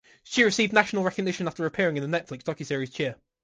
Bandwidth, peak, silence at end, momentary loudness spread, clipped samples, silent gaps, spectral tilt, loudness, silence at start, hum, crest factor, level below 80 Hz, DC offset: 9.8 kHz; -4 dBFS; 0.3 s; 10 LU; under 0.1%; none; -4.5 dB/octave; -26 LUFS; 0.25 s; none; 22 dB; -64 dBFS; under 0.1%